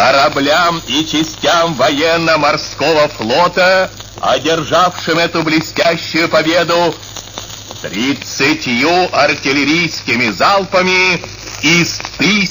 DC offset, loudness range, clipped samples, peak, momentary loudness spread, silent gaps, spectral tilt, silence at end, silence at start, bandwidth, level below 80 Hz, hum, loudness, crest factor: 0.3%; 3 LU; under 0.1%; 0 dBFS; 7 LU; none; -3.5 dB/octave; 0 s; 0 s; 16 kHz; -42 dBFS; none; -12 LUFS; 12 dB